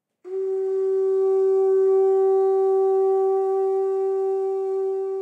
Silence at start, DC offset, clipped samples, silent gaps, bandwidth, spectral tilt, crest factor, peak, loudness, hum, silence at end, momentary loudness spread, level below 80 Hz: 0.25 s; under 0.1%; under 0.1%; none; 2.4 kHz; -6 dB/octave; 8 dB; -14 dBFS; -21 LUFS; none; 0 s; 7 LU; under -90 dBFS